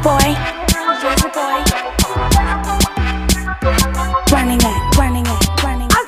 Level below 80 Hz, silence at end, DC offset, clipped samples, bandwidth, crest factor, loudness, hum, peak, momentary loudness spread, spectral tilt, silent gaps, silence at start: -20 dBFS; 0 s; under 0.1%; under 0.1%; 16 kHz; 14 dB; -15 LUFS; none; 0 dBFS; 4 LU; -4 dB/octave; none; 0 s